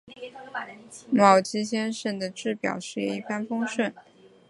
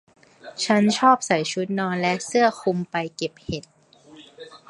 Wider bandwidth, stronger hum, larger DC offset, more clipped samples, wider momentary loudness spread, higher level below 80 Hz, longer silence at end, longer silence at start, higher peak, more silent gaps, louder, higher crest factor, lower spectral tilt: about the same, 11.5 kHz vs 11.5 kHz; neither; neither; neither; about the same, 18 LU vs 16 LU; second, -72 dBFS vs -58 dBFS; first, 0.5 s vs 0.15 s; second, 0.05 s vs 0.45 s; about the same, -2 dBFS vs -4 dBFS; neither; second, -26 LUFS vs -22 LUFS; about the same, 24 dB vs 20 dB; about the same, -4.5 dB/octave vs -4.5 dB/octave